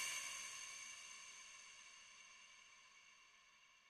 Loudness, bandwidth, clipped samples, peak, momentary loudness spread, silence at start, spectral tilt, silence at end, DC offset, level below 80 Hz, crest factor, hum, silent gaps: -52 LUFS; 13.5 kHz; under 0.1%; -34 dBFS; 18 LU; 0 s; 2.5 dB/octave; 0 s; under 0.1%; -90 dBFS; 22 dB; none; none